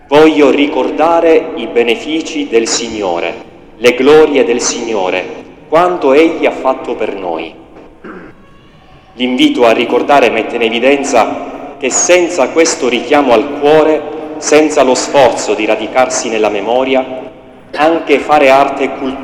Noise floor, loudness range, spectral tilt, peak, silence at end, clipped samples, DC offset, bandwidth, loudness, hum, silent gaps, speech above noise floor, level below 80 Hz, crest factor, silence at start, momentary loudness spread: -39 dBFS; 4 LU; -3 dB/octave; 0 dBFS; 0 s; 1%; under 0.1%; 13.5 kHz; -10 LUFS; none; none; 29 dB; -46 dBFS; 10 dB; 0.1 s; 11 LU